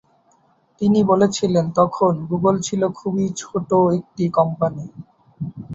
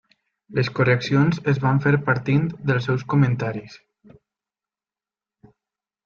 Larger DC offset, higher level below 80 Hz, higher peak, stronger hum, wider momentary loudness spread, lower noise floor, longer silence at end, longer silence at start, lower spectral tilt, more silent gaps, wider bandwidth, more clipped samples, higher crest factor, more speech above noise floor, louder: neither; about the same, -56 dBFS vs -56 dBFS; about the same, -2 dBFS vs -4 dBFS; neither; first, 12 LU vs 7 LU; second, -59 dBFS vs under -90 dBFS; second, 0 s vs 2.3 s; first, 0.8 s vs 0.5 s; second, -6.5 dB/octave vs -8 dB/octave; neither; first, 8 kHz vs 6.8 kHz; neither; about the same, 18 dB vs 18 dB; second, 40 dB vs over 70 dB; about the same, -19 LUFS vs -21 LUFS